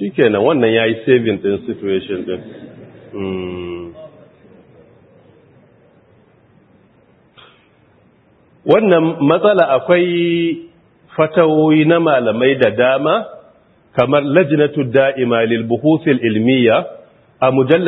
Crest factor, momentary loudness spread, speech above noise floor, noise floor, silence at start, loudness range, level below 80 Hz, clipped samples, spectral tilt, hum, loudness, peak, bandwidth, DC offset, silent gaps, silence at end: 16 dB; 15 LU; 38 dB; -52 dBFS; 0 s; 16 LU; -58 dBFS; under 0.1%; -9.5 dB/octave; none; -14 LUFS; 0 dBFS; 4.1 kHz; under 0.1%; none; 0 s